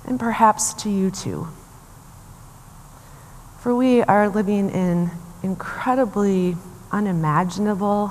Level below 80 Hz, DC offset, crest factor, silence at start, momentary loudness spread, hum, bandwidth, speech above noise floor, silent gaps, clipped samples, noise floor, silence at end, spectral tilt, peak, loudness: -48 dBFS; under 0.1%; 20 dB; 0 s; 12 LU; none; 15 kHz; 24 dB; none; under 0.1%; -44 dBFS; 0 s; -6 dB/octave; 0 dBFS; -21 LUFS